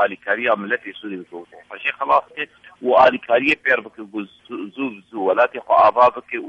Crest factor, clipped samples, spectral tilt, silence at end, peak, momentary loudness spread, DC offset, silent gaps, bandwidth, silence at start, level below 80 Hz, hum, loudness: 18 dB; under 0.1%; -5.5 dB/octave; 0 s; -2 dBFS; 18 LU; under 0.1%; none; 8.2 kHz; 0 s; -62 dBFS; none; -18 LUFS